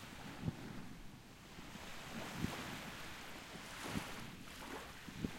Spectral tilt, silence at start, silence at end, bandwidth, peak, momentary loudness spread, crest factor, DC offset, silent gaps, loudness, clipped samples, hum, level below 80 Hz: -4.5 dB/octave; 0 s; 0 s; 16.5 kHz; -24 dBFS; 11 LU; 24 dB; under 0.1%; none; -48 LUFS; under 0.1%; none; -62 dBFS